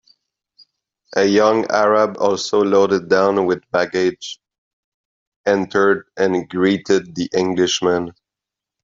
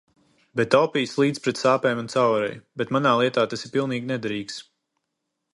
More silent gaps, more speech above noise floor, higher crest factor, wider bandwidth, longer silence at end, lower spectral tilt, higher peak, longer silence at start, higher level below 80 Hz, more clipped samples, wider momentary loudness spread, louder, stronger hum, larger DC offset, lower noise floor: first, 4.58-5.44 s vs none; first, 69 dB vs 57 dB; second, 16 dB vs 22 dB; second, 7.6 kHz vs 11.5 kHz; second, 0.75 s vs 0.9 s; about the same, -4.5 dB/octave vs -5.5 dB/octave; about the same, -2 dBFS vs -2 dBFS; first, 1.15 s vs 0.55 s; first, -60 dBFS vs -68 dBFS; neither; second, 8 LU vs 11 LU; first, -17 LUFS vs -23 LUFS; neither; neither; first, -86 dBFS vs -80 dBFS